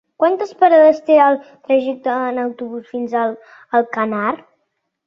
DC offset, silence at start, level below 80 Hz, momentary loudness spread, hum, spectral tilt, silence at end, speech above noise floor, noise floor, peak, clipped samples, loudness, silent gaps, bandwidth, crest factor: under 0.1%; 0.2 s; -66 dBFS; 14 LU; none; -6.5 dB/octave; 0.7 s; 55 dB; -71 dBFS; -2 dBFS; under 0.1%; -16 LUFS; none; 6.8 kHz; 14 dB